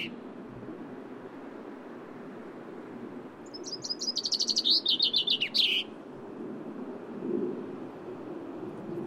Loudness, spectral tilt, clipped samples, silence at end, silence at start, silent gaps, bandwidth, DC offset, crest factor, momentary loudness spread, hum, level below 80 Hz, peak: -28 LUFS; -2 dB/octave; under 0.1%; 0 s; 0 s; none; 16 kHz; under 0.1%; 20 dB; 20 LU; none; -74 dBFS; -12 dBFS